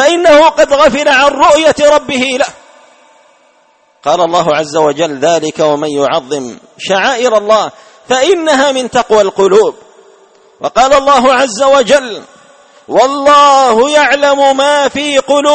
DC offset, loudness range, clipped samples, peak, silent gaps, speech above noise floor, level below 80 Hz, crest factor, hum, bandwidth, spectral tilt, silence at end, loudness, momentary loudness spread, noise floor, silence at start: under 0.1%; 5 LU; 0.3%; 0 dBFS; none; 41 dB; -44 dBFS; 10 dB; none; 8.8 kHz; -3 dB/octave; 0 s; -9 LUFS; 9 LU; -50 dBFS; 0 s